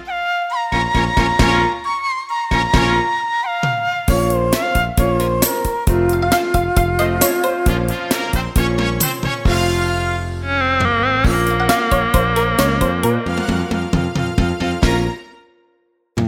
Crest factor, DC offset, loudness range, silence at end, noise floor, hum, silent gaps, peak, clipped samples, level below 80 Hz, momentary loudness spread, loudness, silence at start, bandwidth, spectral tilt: 16 dB; under 0.1%; 2 LU; 0 s; -62 dBFS; none; none; 0 dBFS; under 0.1%; -26 dBFS; 5 LU; -17 LUFS; 0 s; 19.5 kHz; -5 dB/octave